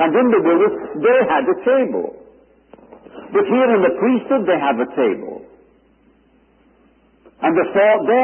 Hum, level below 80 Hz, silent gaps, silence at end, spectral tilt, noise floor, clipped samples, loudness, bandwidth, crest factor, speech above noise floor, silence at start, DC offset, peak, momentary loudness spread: none; -62 dBFS; none; 0 s; -11 dB/octave; -55 dBFS; under 0.1%; -16 LUFS; 3.3 kHz; 14 dB; 39 dB; 0 s; under 0.1%; -4 dBFS; 8 LU